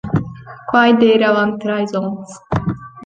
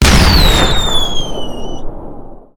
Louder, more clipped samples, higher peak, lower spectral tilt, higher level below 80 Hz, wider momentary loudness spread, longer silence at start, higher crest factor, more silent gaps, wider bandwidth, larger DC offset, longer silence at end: second, -16 LUFS vs -12 LUFS; second, under 0.1% vs 0.1%; about the same, 0 dBFS vs 0 dBFS; first, -6.5 dB/octave vs -4 dB/octave; second, -44 dBFS vs -16 dBFS; second, 16 LU vs 22 LU; about the same, 0.05 s vs 0 s; about the same, 16 dB vs 12 dB; neither; second, 9 kHz vs 19.5 kHz; neither; second, 0 s vs 0.2 s